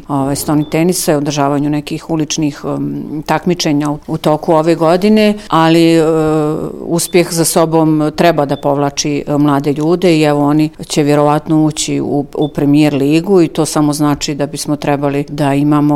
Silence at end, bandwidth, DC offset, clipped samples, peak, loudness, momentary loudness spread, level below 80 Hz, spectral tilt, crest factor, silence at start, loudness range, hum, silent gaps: 0 s; 16.5 kHz; under 0.1%; under 0.1%; 0 dBFS; -12 LUFS; 7 LU; -40 dBFS; -5.5 dB/octave; 12 dB; 0 s; 4 LU; none; none